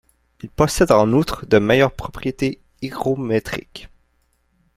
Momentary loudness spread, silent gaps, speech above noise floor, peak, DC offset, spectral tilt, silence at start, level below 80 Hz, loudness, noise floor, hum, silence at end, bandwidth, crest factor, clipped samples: 18 LU; none; 46 dB; -2 dBFS; under 0.1%; -5.5 dB/octave; 0.45 s; -40 dBFS; -19 LUFS; -64 dBFS; none; 0.9 s; 16 kHz; 18 dB; under 0.1%